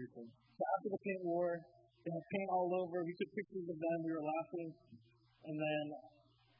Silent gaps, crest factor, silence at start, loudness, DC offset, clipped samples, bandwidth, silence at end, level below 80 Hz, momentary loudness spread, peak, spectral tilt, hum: none; 18 dB; 0 s; -41 LUFS; under 0.1%; under 0.1%; 5.2 kHz; 0.5 s; -86 dBFS; 13 LU; -24 dBFS; -5.5 dB/octave; none